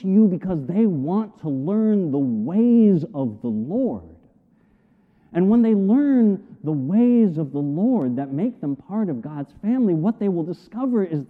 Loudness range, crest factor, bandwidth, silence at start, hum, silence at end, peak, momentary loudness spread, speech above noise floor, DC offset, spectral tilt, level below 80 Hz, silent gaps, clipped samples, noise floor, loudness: 4 LU; 14 dB; 3.6 kHz; 0 s; none; 0.05 s; -8 dBFS; 11 LU; 39 dB; under 0.1%; -12 dB/octave; -60 dBFS; none; under 0.1%; -58 dBFS; -21 LUFS